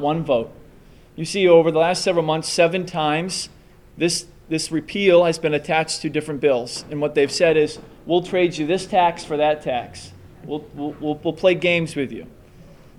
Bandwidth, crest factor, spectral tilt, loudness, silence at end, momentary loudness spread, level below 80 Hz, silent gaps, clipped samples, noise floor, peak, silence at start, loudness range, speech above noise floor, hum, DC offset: 13 kHz; 18 dB; -4.5 dB/octave; -20 LUFS; 0.3 s; 13 LU; -52 dBFS; none; under 0.1%; -47 dBFS; -2 dBFS; 0 s; 3 LU; 27 dB; none; under 0.1%